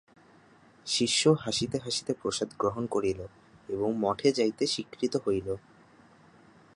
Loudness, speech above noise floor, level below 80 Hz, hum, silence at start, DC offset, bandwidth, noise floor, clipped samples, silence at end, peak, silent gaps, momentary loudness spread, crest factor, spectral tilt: -29 LUFS; 30 dB; -60 dBFS; none; 0.85 s; under 0.1%; 11.5 kHz; -58 dBFS; under 0.1%; 1.15 s; -10 dBFS; none; 13 LU; 22 dB; -4 dB/octave